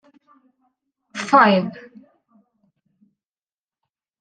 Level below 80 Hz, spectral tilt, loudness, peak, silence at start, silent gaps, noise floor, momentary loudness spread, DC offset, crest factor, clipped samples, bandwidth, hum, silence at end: -74 dBFS; -5.5 dB/octave; -17 LUFS; -2 dBFS; 1.15 s; none; under -90 dBFS; 22 LU; under 0.1%; 22 dB; under 0.1%; 9.4 kHz; none; 2.4 s